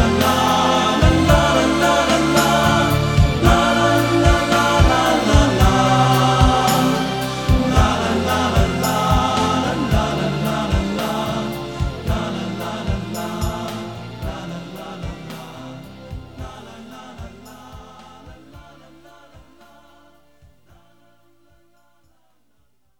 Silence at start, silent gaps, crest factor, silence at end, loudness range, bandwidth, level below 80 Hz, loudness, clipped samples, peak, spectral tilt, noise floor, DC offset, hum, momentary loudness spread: 0 s; none; 18 dB; 4.4 s; 20 LU; 19 kHz; -28 dBFS; -17 LUFS; under 0.1%; 0 dBFS; -5 dB/octave; -66 dBFS; 0.2%; none; 20 LU